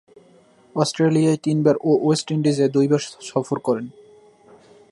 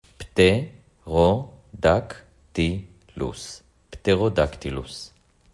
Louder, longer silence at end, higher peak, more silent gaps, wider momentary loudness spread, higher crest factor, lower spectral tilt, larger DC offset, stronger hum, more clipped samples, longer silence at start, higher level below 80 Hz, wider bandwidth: first, -20 LUFS vs -23 LUFS; first, 1 s vs 0.45 s; about the same, -4 dBFS vs -4 dBFS; neither; second, 8 LU vs 21 LU; about the same, 16 dB vs 20 dB; about the same, -6.5 dB/octave vs -6 dB/octave; neither; neither; neither; first, 0.75 s vs 0.2 s; second, -66 dBFS vs -44 dBFS; about the same, 11.5 kHz vs 11.5 kHz